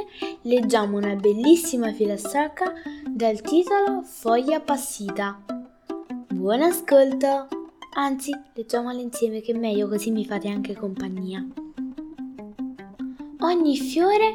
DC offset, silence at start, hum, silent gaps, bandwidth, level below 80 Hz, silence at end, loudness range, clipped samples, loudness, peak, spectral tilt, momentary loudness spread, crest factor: under 0.1%; 0 s; none; none; 18 kHz; -60 dBFS; 0 s; 6 LU; under 0.1%; -23 LUFS; -4 dBFS; -4.5 dB/octave; 17 LU; 18 dB